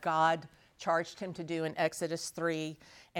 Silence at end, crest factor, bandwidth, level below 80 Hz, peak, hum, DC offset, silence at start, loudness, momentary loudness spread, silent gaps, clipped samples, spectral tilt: 0 s; 18 dB; 18 kHz; -74 dBFS; -16 dBFS; none; under 0.1%; 0 s; -34 LUFS; 12 LU; none; under 0.1%; -4.5 dB/octave